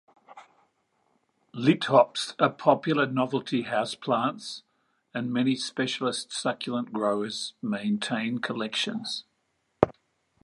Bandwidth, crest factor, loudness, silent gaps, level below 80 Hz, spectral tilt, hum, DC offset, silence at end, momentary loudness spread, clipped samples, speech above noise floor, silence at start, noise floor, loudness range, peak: 11.5 kHz; 28 dB; -27 LUFS; none; -66 dBFS; -5 dB/octave; none; under 0.1%; 0.55 s; 10 LU; under 0.1%; 48 dB; 0.3 s; -75 dBFS; 5 LU; 0 dBFS